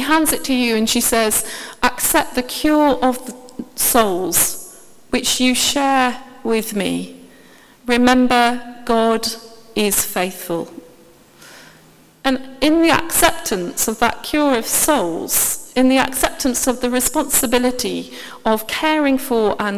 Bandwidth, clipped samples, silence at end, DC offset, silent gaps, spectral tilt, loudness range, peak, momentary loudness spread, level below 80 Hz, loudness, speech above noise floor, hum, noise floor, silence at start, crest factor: 16 kHz; under 0.1%; 0 s; under 0.1%; none; -2 dB/octave; 4 LU; 0 dBFS; 11 LU; -44 dBFS; -17 LUFS; 31 dB; none; -48 dBFS; 0 s; 18 dB